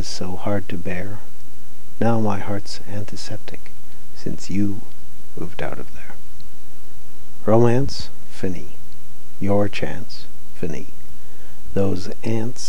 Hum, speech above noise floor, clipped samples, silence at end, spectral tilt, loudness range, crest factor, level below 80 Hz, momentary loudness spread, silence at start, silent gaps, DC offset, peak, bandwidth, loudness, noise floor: none; 23 dB; under 0.1%; 0 s; -6.5 dB/octave; 8 LU; 24 dB; -48 dBFS; 25 LU; 0 s; none; 30%; -4 dBFS; 19.5 kHz; -25 LUFS; -47 dBFS